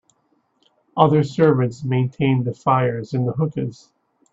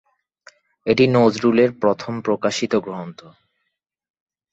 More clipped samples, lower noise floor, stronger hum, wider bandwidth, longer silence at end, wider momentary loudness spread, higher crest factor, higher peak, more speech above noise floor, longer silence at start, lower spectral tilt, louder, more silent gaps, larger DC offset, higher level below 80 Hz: neither; second, -66 dBFS vs -76 dBFS; neither; about the same, 7.8 kHz vs 8 kHz; second, 0.6 s vs 1.25 s; second, 8 LU vs 15 LU; about the same, 20 dB vs 18 dB; about the same, 0 dBFS vs -2 dBFS; second, 47 dB vs 58 dB; about the same, 0.95 s vs 0.85 s; first, -8.5 dB/octave vs -6 dB/octave; about the same, -20 LUFS vs -19 LUFS; neither; neither; about the same, -58 dBFS vs -60 dBFS